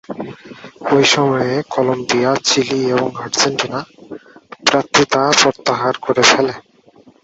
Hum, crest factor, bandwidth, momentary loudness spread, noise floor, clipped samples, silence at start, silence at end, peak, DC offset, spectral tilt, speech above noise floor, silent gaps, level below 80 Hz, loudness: none; 16 dB; 8.2 kHz; 17 LU; -48 dBFS; under 0.1%; 0.1 s; 0.65 s; 0 dBFS; under 0.1%; -3 dB/octave; 32 dB; none; -56 dBFS; -15 LUFS